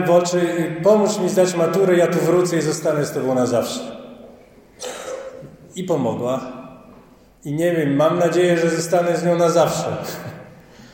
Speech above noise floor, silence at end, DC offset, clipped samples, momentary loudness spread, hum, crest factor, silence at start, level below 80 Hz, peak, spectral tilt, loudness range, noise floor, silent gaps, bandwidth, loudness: 30 dB; 0.05 s; under 0.1%; under 0.1%; 18 LU; none; 16 dB; 0 s; -60 dBFS; -2 dBFS; -5.5 dB/octave; 10 LU; -48 dBFS; none; 17 kHz; -18 LUFS